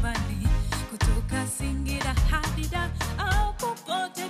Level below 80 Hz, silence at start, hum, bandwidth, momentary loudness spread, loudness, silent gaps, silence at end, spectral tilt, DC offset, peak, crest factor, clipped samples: -28 dBFS; 0 s; none; 15.5 kHz; 4 LU; -28 LUFS; none; 0 s; -4.5 dB/octave; under 0.1%; -14 dBFS; 14 dB; under 0.1%